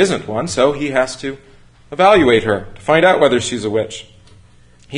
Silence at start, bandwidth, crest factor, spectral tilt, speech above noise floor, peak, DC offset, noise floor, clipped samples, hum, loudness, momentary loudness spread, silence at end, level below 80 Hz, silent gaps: 0 s; 11 kHz; 16 dB; -4.5 dB/octave; 31 dB; 0 dBFS; under 0.1%; -46 dBFS; under 0.1%; 60 Hz at -45 dBFS; -15 LUFS; 16 LU; 0 s; -46 dBFS; none